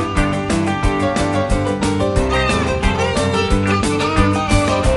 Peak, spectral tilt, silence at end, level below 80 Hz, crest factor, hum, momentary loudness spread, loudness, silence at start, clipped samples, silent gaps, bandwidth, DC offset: -2 dBFS; -5.5 dB/octave; 0 s; -24 dBFS; 14 dB; none; 3 LU; -17 LUFS; 0 s; under 0.1%; none; 11.5 kHz; under 0.1%